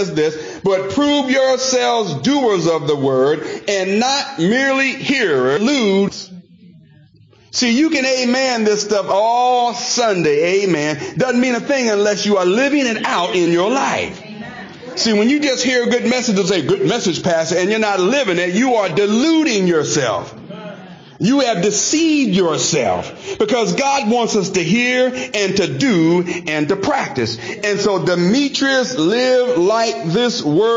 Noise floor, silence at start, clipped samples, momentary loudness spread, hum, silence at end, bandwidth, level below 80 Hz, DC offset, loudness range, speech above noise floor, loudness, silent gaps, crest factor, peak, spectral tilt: -48 dBFS; 0 s; under 0.1%; 6 LU; none; 0 s; 7.8 kHz; -56 dBFS; under 0.1%; 2 LU; 32 dB; -16 LUFS; none; 10 dB; -6 dBFS; -4 dB/octave